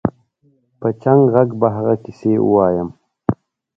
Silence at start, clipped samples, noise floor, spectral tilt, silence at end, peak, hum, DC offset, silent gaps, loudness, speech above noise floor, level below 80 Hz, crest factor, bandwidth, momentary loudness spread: 0.05 s; under 0.1%; -59 dBFS; -11.5 dB/octave; 0.45 s; 0 dBFS; none; under 0.1%; none; -17 LUFS; 44 dB; -46 dBFS; 16 dB; 6 kHz; 11 LU